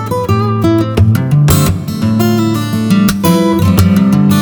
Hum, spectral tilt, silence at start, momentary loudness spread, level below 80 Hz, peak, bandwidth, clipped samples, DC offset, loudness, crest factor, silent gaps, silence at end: none; -6.5 dB/octave; 0 s; 5 LU; -30 dBFS; 0 dBFS; over 20 kHz; under 0.1%; under 0.1%; -11 LUFS; 10 dB; none; 0 s